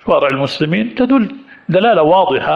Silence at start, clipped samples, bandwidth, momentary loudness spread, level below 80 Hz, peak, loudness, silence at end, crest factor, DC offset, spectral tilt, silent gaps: 0.05 s; under 0.1%; 9 kHz; 7 LU; -50 dBFS; -2 dBFS; -13 LUFS; 0 s; 12 dB; under 0.1%; -7.5 dB/octave; none